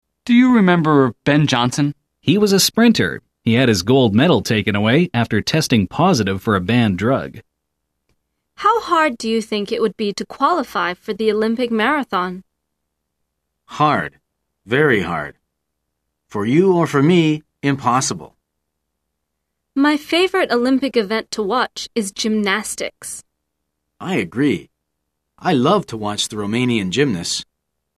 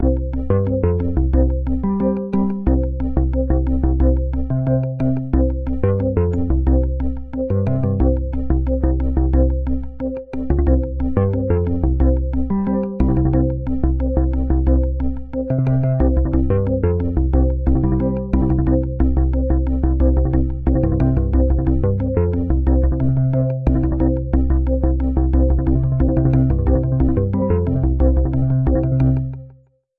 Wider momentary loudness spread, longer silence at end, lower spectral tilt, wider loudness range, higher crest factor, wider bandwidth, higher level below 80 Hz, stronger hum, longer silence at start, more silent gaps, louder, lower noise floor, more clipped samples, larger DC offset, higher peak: first, 10 LU vs 4 LU; about the same, 0.55 s vs 0.5 s; second, -5 dB/octave vs -13 dB/octave; first, 6 LU vs 2 LU; about the same, 16 dB vs 14 dB; first, 14 kHz vs 2.8 kHz; second, -54 dBFS vs -20 dBFS; neither; first, 0.25 s vs 0 s; neither; about the same, -17 LUFS vs -19 LUFS; first, -76 dBFS vs -49 dBFS; neither; neither; about the same, -2 dBFS vs -2 dBFS